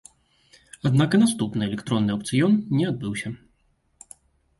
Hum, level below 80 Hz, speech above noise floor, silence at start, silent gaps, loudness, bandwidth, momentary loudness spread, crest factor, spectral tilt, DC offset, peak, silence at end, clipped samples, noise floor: none; -56 dBFS; 44 dB; 0.85 s; none; -23 LUFS; 12 kHz; 11 LU; 16 dB; -6 dB/octave; under 0.1%; -8 dBFS; 1.25 s; under 0.1%; -66 dBFS